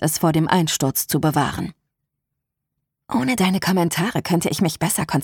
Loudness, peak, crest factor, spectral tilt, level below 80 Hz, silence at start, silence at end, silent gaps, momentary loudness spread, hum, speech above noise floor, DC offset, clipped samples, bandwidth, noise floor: -20 LUFS; -2 dBFS; 20 dB; -4.5 dB/octave; -50 dBFS; 0 s; 0 s; none; 5 LU; none; 60 dB; under 0.1%; under 0.1%; 19 kHz; -80 dBFS